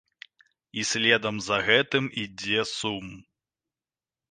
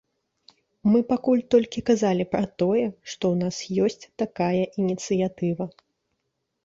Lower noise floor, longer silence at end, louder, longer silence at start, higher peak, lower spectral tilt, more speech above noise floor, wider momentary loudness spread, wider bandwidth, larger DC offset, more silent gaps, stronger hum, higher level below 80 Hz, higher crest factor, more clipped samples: first, under -90 dBFS vs -78 dBFS; first, 1.1 s vs 0.95 s; about the same, -25 LUFS vs -24 LUFS; about the same, 0.75 s vs 0.85 s; about the same, -6 dBFS vs -6 dBFS; second, -3 dB/octave vs -6.5 dB/octave; first, over 64 dB vs 55 dB; first, 12 LU vs 7 LU; first, 10 kHz vs 7.8 kHz; neither; neither; neither; about the same, -62 dBFS vs -60 dBFS; first, 24 dB vs 18 dB; neither